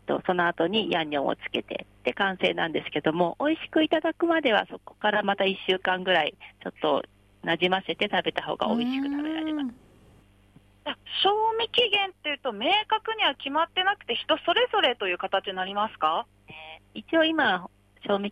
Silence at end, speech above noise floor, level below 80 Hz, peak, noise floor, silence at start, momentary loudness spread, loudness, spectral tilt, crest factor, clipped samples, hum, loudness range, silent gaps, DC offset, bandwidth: 0 s; 31 dB; -64 dBFS; -10 dBFS; -57 dBFS; 0.05 s; 10 LU; -26 LUFS; -5.5 dB/octave; 16 dB; under 0.1%; none; 3 LU; none; under 0.1%; 9.6 kHz